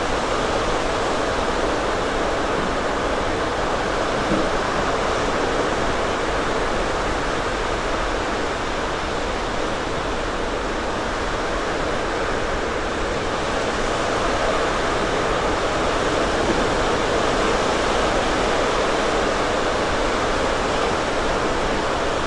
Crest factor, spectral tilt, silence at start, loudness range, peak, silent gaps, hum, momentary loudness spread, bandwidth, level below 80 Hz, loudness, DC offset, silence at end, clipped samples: 14 dB; -4 dB/octave; 0 s; 4 LU; -6 dBFS; none; none; 4 LU; 11.5 kHz; -32 dBFS; -22 LUFS; under 0.1%; 0 s; under 0.1%